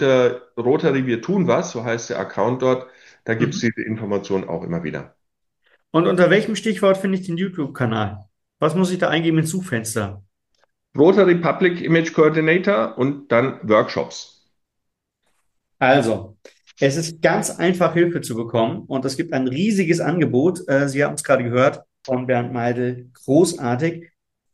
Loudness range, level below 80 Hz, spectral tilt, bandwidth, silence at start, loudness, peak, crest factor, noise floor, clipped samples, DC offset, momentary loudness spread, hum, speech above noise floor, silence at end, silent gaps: 5 LU; -62 dBFS; -6 dB/octave; 12.5 kHz; 0 s; -19 LUFS; -2 dBFS; 18 dB; -78 dBFS; under 0.1%; under 0.1%; 10 LU; none; 59 dB; 0.5 s; none